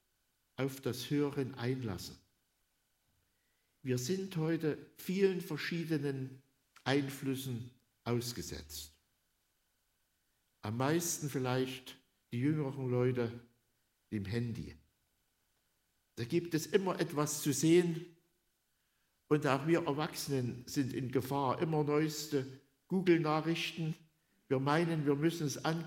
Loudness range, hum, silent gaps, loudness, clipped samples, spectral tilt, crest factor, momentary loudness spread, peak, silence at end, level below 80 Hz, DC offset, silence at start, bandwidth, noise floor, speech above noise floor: 7 LU; none; none; -35 LUFS; under 0.1%; -5.5 dB/octave; 22 dB; 14 LU; -14 dBFS; 0 s; -70 dBFS; under 0.1%; 0.6 s; 16 kHz; -79 dBFS; 45 dB